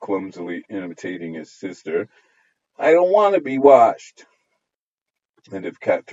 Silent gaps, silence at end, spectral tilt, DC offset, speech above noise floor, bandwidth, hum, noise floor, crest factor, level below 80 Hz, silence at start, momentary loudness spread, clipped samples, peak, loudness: 4.76-5.06 s, 5.29-5.34 s; 0 s; -6 dB/octave; under 0.1%; 67 dB; 7.8 kHz; none; -86 dBFS; 20 dB; -72 dBFS; 0 s; 20 LU; under 0.1%; 0 dBFS; -18 LUFS